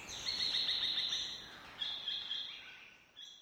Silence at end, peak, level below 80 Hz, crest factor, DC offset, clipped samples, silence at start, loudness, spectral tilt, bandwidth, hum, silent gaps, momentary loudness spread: 0 s; -22 dBFS; -70 dBFS; 18 dB; under 0.1%; under 0.1%; 0 s; -36 LUFS; 0.5 dB/octave; over 20 kHz; none; none; 20 LU